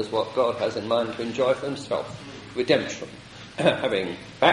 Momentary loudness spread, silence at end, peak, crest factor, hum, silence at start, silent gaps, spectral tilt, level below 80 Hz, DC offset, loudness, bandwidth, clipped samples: 14 LU; 0 s; -4 dBFS; 20 dB; none; 0 s; none; -5 dB/octave; -60 dBFS; under 0.1%; -25 LUFS; 11.5 kHz; under 0.1%